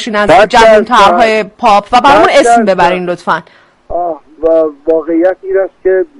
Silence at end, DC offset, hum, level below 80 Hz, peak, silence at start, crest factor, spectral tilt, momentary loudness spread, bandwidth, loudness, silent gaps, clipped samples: 0.15 s; under 0.1%; none; -36 dBFS; 0 dBFS; 0 s; 8 dB; -4 dB/octave; 11 LU; 11.5 kHz; -8 LUFS; none; 1%